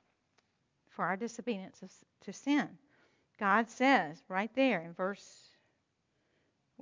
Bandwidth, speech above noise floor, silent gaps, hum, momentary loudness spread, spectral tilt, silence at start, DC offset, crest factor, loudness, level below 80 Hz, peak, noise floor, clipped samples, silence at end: 7.6 kHz; 46 dB; none; none; 20 LU; -5 dB/octave; 1 s; under 0.1%; 22 dB; -33 LUFS; -88 dBFS; -14 dBFS; -79 dBFS; under 0.1%; 1.5 s